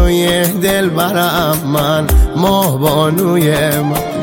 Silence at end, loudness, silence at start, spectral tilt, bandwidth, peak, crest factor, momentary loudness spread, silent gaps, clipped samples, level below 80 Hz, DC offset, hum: 0 s; -13 LUFS; 0 s; -5 dB/octave; 17 kHz; 0 dBFS; 12 dB; 2 LU; none; under 0.1%; -20 dBFS; under 0.1%; none